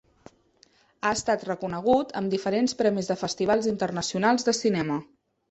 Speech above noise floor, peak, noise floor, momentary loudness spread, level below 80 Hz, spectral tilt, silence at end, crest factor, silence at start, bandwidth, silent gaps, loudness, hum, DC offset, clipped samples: 36 dB; -8 dBFS; -61 dBFS; 6 LU; -60 dBFS; -4.5 dB/octave; 0.45 s; 18 dB; 1.05 s; 8.4 kHz; none; -26 LUFS; none; under 0.1%; under 0.1%